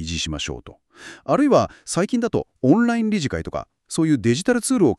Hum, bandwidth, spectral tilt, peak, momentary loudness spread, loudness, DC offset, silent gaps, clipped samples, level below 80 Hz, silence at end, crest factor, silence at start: none; 13 kHz; -5.5 dB/octave; -4 dBFS; 13 LU; -21 LUFS; under 0.1%; none; under 0.1%; -44 dBFS; 0.05 s; 18 dB; 0 s